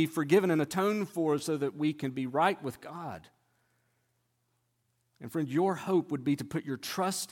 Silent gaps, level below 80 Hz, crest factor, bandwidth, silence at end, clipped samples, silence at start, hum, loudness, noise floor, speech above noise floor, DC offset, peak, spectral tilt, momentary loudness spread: none; -74 dBFS; 20 dB; 17 kHz; 0.05 s; under 0.1%; 0 s; none; -31 LUFS; -77 dBFS; 46 dB; under 0.1%; -12 dBFS; -5.5 dB/octave; 15 LU